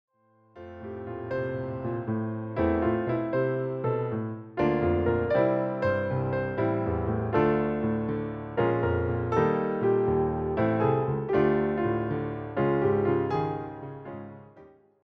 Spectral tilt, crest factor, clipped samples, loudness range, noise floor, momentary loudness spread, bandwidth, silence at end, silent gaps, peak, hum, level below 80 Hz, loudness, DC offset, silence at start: -10 dB/octave; 18 dB; under 0.1%; 3 LU; -58 dBFS; 11 LU; 6.2 kHz; 0.4 s; none; -10 dBFS; none; -48 dBFS; -27 LUFS; under 0.1%; 0.55 s